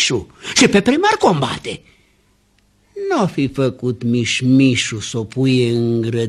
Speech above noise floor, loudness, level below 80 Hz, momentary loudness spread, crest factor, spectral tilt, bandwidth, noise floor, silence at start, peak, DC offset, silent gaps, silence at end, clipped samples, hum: 41 dB; -16 LUFS; -50 dBFS; 11 LU; 16 dB; -4.5 dB/octave; 12.5 kHz; -58 dBFS; 0 s; 0 dBFS; under 0.1%; none; 0 s; under 0.1%; 50 Hz at -50 dBFS